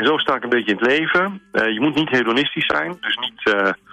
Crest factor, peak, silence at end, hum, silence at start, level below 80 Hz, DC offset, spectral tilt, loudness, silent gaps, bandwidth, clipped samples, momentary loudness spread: 12 dB; -6 dBFS; 0.15 s; none; 0 s; -58 dBFS; under 0.1%; -5 dB/octave; -18 LUFS; none; 9.6 kHz; under 0.1%; 5 LU